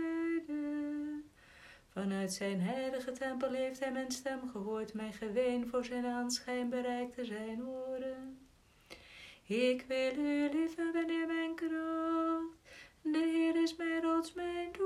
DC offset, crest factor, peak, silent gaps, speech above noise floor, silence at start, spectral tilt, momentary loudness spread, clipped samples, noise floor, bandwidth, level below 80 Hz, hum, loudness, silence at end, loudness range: under 0.1%; 14 dB; -22 dBFS; none; 28 dB; 0 s; -5 dB/octave; 13 LU; under 0.1%; -64 dBFS; 14 kHz; -70 dBFS; none; -37 LUFS; 0 s; 4 LU